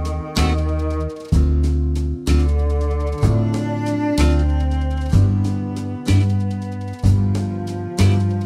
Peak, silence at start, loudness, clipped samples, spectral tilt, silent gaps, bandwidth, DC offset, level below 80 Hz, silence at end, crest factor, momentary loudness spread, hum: -2 dBFS; 0 s; -19 LUFS; under 0.1%; -7 dB/octave; none; 12 kHz; under 0.1%; -22 dBFS; 0 s; 14 dB; 8 LU; none